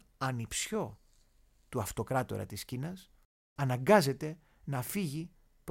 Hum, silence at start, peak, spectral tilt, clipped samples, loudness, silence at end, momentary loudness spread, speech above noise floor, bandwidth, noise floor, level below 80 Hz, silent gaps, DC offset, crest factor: none; 0.2 s; -10 dBFS; -5 dB/octave; under 0.1%; -34 LUFS; 0 s; 19 LU; 33 dB; 16.5 kHz; -66 dBFS; -60 dBFS; 3.25-3.56 s; under 0.1%; 24 dB